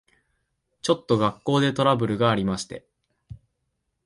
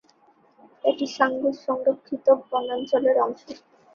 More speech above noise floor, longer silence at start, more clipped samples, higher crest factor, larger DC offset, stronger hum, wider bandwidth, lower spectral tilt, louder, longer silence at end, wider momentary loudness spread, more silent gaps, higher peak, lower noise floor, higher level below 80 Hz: first, 54 dB vs 36 dB; about the same, 0.85 s vs 0.85 s; neither; about the same, 20 dB vs 20 dB; neither; neither; first, 11.5 kHz vs 7 kHz; first, -6 dB/octave vs -4.5 dB/octave; about the same, -23 LUFS vs -24 LUFS; first, 0.7 s vs 0.4 s; first, 10 LU vs 7 LU; neither; about the same, -6 dBFS vs -4 dBFS; first, -77 dBFS vs -59 dBFS; first, -56 dBFS vs -72 dBFS